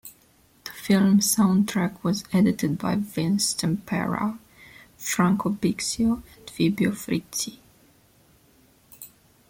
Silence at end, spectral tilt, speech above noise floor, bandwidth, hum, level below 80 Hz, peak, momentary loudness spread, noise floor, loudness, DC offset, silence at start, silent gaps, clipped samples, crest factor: 0.45 s; -5 dB/octave; 36 dB; 16.5 kHz; none; -56 dBFS; -8 dBFS; 21 LU; -59 dBFS; -24 LUFS; under 0.1%; 0.05 s; none; under 0.1%; 16 dB